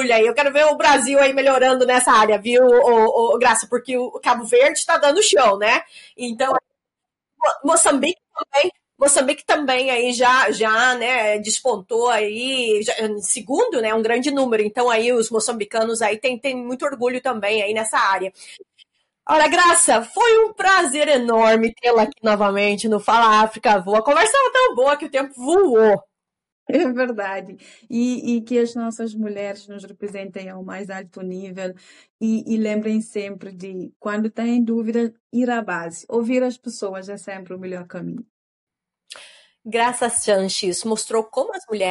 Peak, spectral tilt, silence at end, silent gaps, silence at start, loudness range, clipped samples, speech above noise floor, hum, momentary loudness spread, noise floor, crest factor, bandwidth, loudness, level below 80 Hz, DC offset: -2 dBFS; -2.5 dB/octave; 0 s; 26.52-26.66 s, 32.10-32.19 s, 33.96-34.00 s, 35.20-35.30 s, 38.30-38.67 s; 0 s; 11 LU; under 0.1%; 66 dB; none; 17 LU; -84 dBFS; 16 dB; 11.5 kHz; -18 LUFS; -62 dBFS; under 0.1%